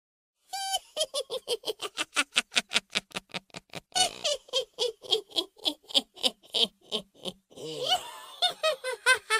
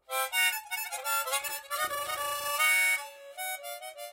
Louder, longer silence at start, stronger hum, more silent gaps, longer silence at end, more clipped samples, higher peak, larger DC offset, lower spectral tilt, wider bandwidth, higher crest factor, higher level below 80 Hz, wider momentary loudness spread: about the same, -29 LUFS vs -29 LUFS; first, 0.55 s vs 0.1 s; neither; neither; about the same, 0 s vs 0 s; neither; first, -2 dBFS vs -14 dBFS; neither; first, 0 dB/octave vs 2.5 dB/octave; about the same, 15.5 kHz vs 16 kHz; first, 30 dB vs 18 dB; about the same, -72 dBFS vs -74 dBFS; about the same, 14 LU vs 14 LU